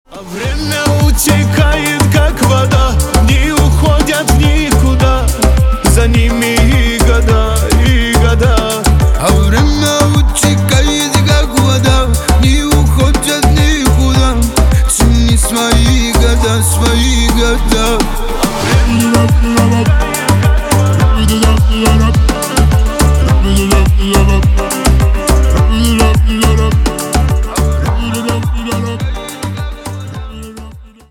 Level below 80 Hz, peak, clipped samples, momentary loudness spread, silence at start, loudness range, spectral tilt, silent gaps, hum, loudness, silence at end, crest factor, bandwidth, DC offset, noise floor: -12 dBFS; 0 dBFS; under 0.1%; 6 LU; 0.1 s; 2 LU; -5 dB/octave; none; none; -11 LUFS; 0.25 s; 10 dB; 18 kHz; under 0.1%; -31 dBFS